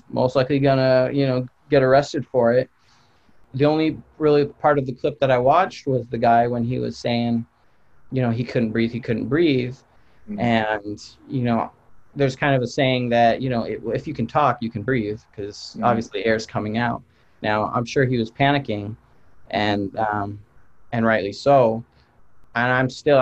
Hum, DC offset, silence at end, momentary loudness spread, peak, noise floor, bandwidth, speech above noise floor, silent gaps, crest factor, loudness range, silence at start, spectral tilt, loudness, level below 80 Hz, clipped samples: none; under 0.1%; 0 s; 12 LU; -4 dBFS; -58 dBFS; 8.2 kHz; 38 dB; none; 18 dB; 4 LU; 0.1 s; -7 dB/octave; -21 LUFS; -52 dBFS; under 0.1%